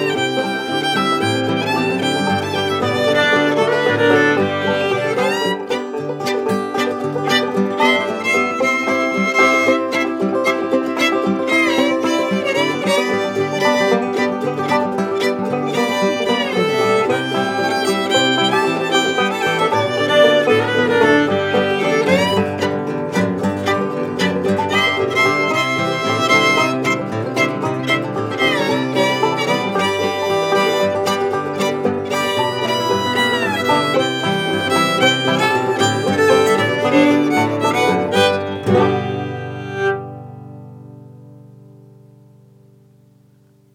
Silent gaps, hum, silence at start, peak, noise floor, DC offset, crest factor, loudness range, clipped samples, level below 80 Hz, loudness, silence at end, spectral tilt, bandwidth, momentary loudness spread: none; 50 Hz at -50 dBFS; 0 s; 0 dBFS; -52 dBFS; under 0.1%; 16 dB; 3 LU; under 0.1%; -62 dBFS; -16 LUFS; 2.2 s; -4.5 dB/octave; 16.5 kHz; 6 LU